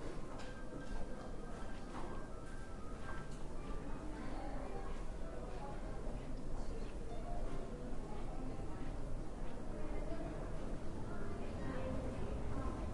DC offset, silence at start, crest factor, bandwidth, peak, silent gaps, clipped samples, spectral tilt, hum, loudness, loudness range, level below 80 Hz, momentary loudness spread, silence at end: under 0.1%; 0 s; 12 dB; 11 kHz; -28 dBFS; none; under 0.1%; -6.5 dB/octave; none; -48 LUFS; 3 LU; -46 dBFS; 6 LU; 0 s